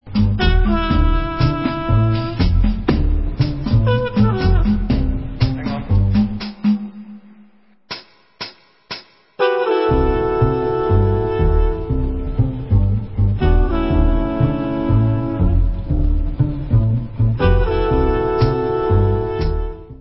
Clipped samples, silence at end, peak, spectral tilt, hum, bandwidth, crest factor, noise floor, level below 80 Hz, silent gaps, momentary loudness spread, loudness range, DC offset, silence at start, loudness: under 0.1%; 0.05 s; -2 dBFS; -12 dB/octave; none; 5.8 kHz; 14 dB; -51 dBFS; -20 dBFS; none; 7 LU; 4 LU; 0.3%; 0.05 s; -18 LUFS